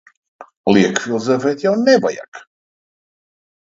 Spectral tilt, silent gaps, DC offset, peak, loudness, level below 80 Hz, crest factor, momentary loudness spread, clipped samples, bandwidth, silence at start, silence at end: -5 dB/octave; 0.57-0.64 s, 2.28-2.32 s; under 0.1%; 0 dBFS; -16 LUFS; -62 dBFS; 18 dB; 10 LU; under 0.1%; 7.8 kHz; 0.4 s; 1.4 s